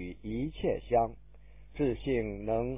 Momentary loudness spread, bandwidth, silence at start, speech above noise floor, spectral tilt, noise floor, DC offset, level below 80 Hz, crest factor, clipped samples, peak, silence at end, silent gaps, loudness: 7 LU; 3.8 kHz; 0 s; 23 dB; -6.5 dB/octave; -55 dBFS; 0.3%; -48 dBFS; 16 dB; under 0.1%; -16 dBFS; 0 s; none; -33 LUFS